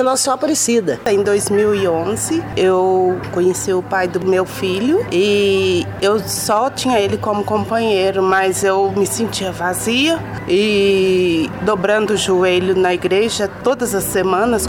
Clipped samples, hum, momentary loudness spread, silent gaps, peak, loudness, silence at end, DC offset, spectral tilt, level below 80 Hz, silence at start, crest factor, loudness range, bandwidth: under 0.1%; none; 4 LU; none; -2 dBFS; -16 LUFS; 0 s; under 0.1%; -4 dB/octave; -44 dBFS; 0 s; 14 dB; 1 LU; 18 kHz